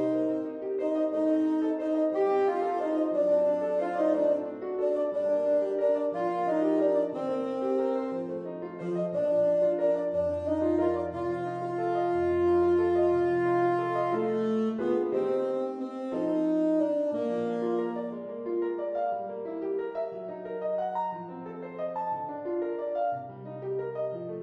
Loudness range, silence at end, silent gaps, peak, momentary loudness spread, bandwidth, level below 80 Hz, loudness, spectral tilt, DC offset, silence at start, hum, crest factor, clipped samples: 7 LU; 0 s; none; -14 dBFS; 10 LU; 8.8 kHz; -64 dBFS; -29 LUFS; -8.5 dB/octave; under 0.1%; 0 s; none; 14 dB; under 0.1%